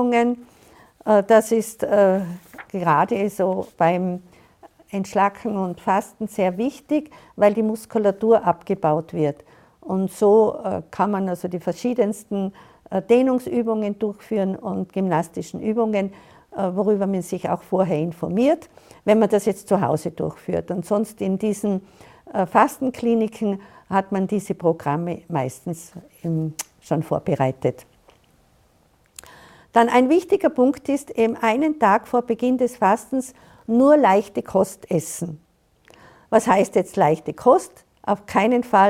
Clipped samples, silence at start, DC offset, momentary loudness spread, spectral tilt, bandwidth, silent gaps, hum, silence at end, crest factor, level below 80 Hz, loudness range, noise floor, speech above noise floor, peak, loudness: under 0.1%; 0 s; under 0.1%; 11 LU; -6.5 dB/octave; 16.5 kHz; none; none; 0 s; 20 dB; -60 dBFS; 5 LU; -59 dBFS; 39 dB; -2 dBFS; -21 LUFS